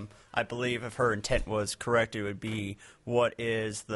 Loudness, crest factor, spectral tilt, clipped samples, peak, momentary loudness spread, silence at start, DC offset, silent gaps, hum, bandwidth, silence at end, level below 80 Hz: -31 LUFS; 20 dB; -4.5 dB/octave; under 0.1%; -12 dBFS; 7 LU; 0 s; under 0.1%; none; none; 11.5 kHz; 0 s; -48 dBFS